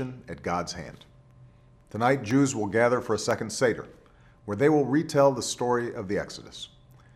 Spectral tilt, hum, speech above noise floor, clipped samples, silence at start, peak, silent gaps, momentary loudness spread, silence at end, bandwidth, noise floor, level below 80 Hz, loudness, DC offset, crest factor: -5 dB/octave; none; 29 dB; under 0.1%; 0 s; -8 dBFS; none; 18 LU; 0.5 s; 14 kHz; -55 dBFS; -58 dBFS; -26 LUFS; under 0.1%; 18 dB